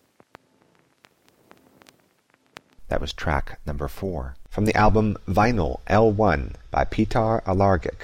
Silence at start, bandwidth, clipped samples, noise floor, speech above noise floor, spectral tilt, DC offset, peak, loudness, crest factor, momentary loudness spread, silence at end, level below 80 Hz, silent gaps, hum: 2.8 s; 16 kHz; under 0.1%; -64 dBFS; 42 dB; -7 dB/octave; under 0.1%; -8 dBFS; -23 LUFS; 16 dB; 12 LU; 0 s; -34 dBFS; none; none